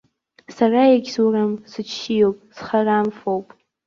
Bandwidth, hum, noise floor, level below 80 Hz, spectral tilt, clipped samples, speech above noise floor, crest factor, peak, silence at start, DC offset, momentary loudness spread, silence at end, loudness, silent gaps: 7.4 kHz; none; -46 dBFS; -62 dBFS; -6 dB/octave; under 0.1%; 28 dB; 16 dB; -4 dBFS; 0.5 s; under 0.1%; 13 LU; 0.45 s; -19 LUFS; none